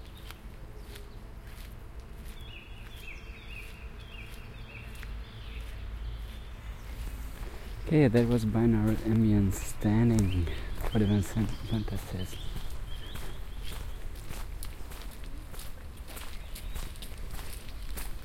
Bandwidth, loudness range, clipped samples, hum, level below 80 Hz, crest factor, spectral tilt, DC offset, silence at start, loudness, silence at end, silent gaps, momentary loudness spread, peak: 16.5 kHz; 18 LU; under 0.1%; none; -40 dBFS; 22 dB; -7 dB/octave; under 0.1%; 0 s; -32 LUFS; 0 s; none; 20 LU; -10 dBFS